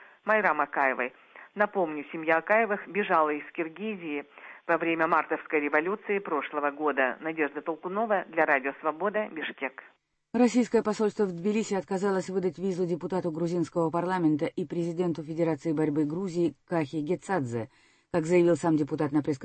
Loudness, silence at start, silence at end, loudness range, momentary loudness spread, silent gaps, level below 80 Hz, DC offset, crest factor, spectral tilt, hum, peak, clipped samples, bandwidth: -28 LUFS; 0 s; 0 s; 2 LU; 9 LU; none; -70 dBFS; under 0.1%; 18 dB; -6.5 dB/octave; none; -10 dBFS; under 0.1%; 8.8 kHz